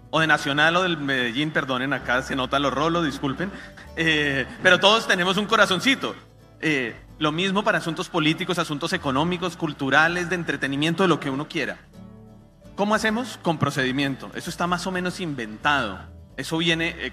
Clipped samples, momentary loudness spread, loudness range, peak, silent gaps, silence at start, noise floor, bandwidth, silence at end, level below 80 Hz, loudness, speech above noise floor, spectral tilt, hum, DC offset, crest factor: under 0.1%; 12 LU; 5 LU; 0 dBFS; none; 0.05 s; -47 dBFS; 14.5 kHz; 0 s; -50 dBFS; -22 LUFS; 24 dB; -4.5 dB/octave; none; under 0.1%; 22 dB